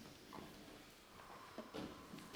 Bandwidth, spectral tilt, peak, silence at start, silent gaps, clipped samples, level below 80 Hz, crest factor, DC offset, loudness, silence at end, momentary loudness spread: over 20 kHz; -4.5 dB/octave; -38 dBFS; 0 s; none; under 0.1%; -72 dBFS; 18 dB; under 0.1%; -55 LUFS; 0 s; 8 LU